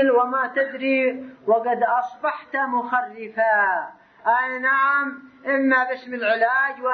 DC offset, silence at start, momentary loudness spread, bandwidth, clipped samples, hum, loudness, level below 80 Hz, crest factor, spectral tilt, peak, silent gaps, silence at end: under 0.1%; 0 s; 9 LU; 6.2 kHz; under 0.1%; none; -21 LUFS; -76 dBFS; 14 dB; -6 dB/octave; -6 dBFS; none; 0 s